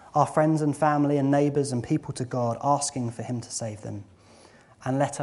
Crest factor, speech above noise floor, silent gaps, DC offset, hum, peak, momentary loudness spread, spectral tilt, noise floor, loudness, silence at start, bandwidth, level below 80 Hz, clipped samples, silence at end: 20 dB; 28 dB; none; under 0.1%; none; -6 dBFS; 12 LU; -6 dB/octave; -53 dBFS; -26 LUFS; 0.05 s; 11.5 kHz; -62 dBFS; under 0.1%; 0 s